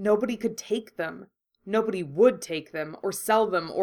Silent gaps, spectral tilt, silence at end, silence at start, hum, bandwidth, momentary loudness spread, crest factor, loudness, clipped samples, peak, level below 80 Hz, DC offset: none; -4.5 dB/octave; 0 s; 0 s; none; 19 kHz; 12 LU; 20 dB; -27 LUFS; under 0.1%; -6 dBFS; -70 dBFS; under 0.1%